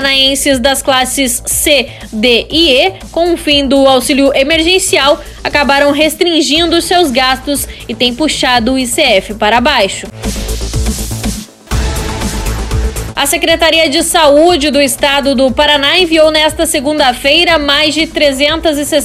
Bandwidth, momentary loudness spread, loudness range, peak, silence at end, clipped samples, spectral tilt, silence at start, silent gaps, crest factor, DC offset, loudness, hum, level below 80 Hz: 16.5 kHz; 10 LU; 5 LU; 0 dBFS; 0 s; 0.4%; -3 dB/octave; 0 s; none; 10 dB; under 0.1%; -9 LUFS; none; -24 dBFS